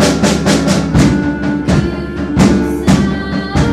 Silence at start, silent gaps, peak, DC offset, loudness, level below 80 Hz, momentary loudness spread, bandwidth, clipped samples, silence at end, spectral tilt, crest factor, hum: 0 s; none; 0 dBFS; under 0.1%; -13 LUFS; -24 dBFS; 6 LU; 14.5 kHz; under 0.1%; 0 s; -5.5 dB/octave; 12 dB; none